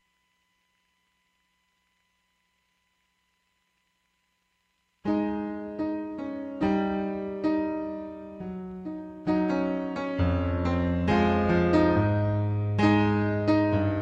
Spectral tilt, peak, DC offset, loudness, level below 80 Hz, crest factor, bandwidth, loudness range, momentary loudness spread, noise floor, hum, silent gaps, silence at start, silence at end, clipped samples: -8.5 dB/octave; -10 dBFS; under 0.1%; -27 LUFS; -48 dBFS; 18 dB; 8 kHz; 11 LU; 15 LU; -74 dBFS; none; none; 5.05 s; 0 s; under 0.1%